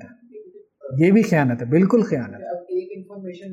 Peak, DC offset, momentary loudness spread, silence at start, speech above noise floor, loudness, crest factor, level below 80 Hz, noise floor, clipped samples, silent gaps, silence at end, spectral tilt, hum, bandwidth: -4 dBFS; under 0.1%; 19 LU; 0 s; 26 dB; -19 LUFS; 16 dB; -64 dBFS; -43 dBFS; under 0.1%; none; 0 s; -8.5 dB/octave; none; 12 kHz